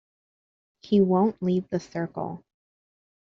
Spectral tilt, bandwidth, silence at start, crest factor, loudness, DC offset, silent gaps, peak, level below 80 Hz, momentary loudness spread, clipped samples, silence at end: -8 dB/octave; 7.2 kHz; 0.85 s; 18 dB; -25 LUFS; under 0.1%; none; -10 dBFS; -66 dBFS; 14 LU; under 0.1%; 0.9 s